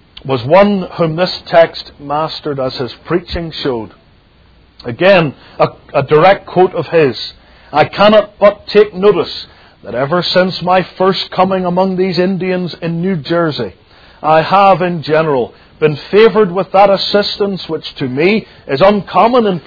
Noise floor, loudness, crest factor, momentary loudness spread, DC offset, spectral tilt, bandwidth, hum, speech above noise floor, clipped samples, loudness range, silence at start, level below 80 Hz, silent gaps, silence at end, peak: -46 dBFS; -12 LUFS; 12 dB; 12 LU; under 0.1%; -7.5 dB/octave; 5.4 kHz; none; 34 dB; 0.6%; 5 LU; 0.25 s; -42 dBFS; none; 0.05 s; 0 dBFS